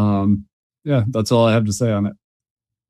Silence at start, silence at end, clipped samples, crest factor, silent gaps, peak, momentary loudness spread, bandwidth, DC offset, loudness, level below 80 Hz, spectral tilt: 0 s; 0.75 s; under 0.1%; 16 dB; 0.53-0.70 s; -4 dBFS; 8 LU; 13.5 kHz; under 0.1%; -19 LUFS; -52 dBFS; -6.5 dB/octave